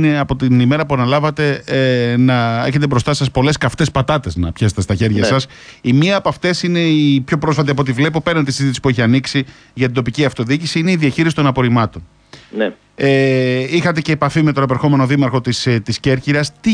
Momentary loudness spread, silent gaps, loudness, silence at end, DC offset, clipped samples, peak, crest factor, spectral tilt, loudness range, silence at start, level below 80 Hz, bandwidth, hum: 5 LU; none; -15 LUFS; 0 s; under 0.1%; under 0.1%; -2 dBFS; 14 dB; -6 dB/octave; 2 LU; 0 s; -40 dBFS; 10.5 kHz; none